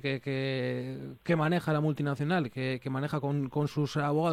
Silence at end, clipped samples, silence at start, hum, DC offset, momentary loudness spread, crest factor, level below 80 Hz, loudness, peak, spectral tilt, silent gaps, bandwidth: 0 s; under 0.1%; 0.05 s; none; under 0.1%; 6 LU; 14 dB; -66 dBFS; -31 LUFS; -16 dBFS; -7.5 dB/octave; none; 13.5 kHz